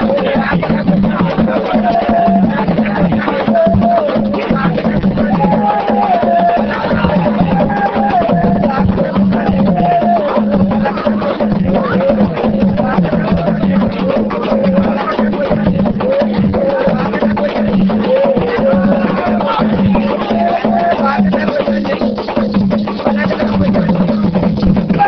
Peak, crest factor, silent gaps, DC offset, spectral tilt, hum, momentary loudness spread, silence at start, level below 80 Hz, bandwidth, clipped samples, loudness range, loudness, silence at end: 0 dBFS; 12 dB; none; under 0.1%; -9.5 dB/octave; none; 3 LU; 0 s; -32 dBFS; 6 kHz; under 0.1%; 1 LU; -13 LUFS; 0 s